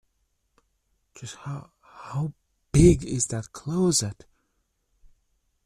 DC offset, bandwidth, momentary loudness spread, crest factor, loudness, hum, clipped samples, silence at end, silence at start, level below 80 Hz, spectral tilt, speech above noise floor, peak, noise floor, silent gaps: under 0.1%; 14.5 kHz; 21 LU; 22 dB; -24 LUFS; none; under 0.1%; 1.5 s; 1.2 s; -40 dBFS; -5.5 dB/octave; 50 dB; -4 dBFS; -74 dBFS; none